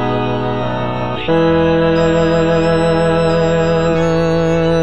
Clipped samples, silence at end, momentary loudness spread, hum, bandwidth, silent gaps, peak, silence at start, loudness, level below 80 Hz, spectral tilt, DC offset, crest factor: under 0.1%; 0 s; 6 LU; none; 8.4 kHz; none; -2 dBFS; 0 s; -14 LUFS; -34 dBFS; -7 dB/octave; 3%; 10 dB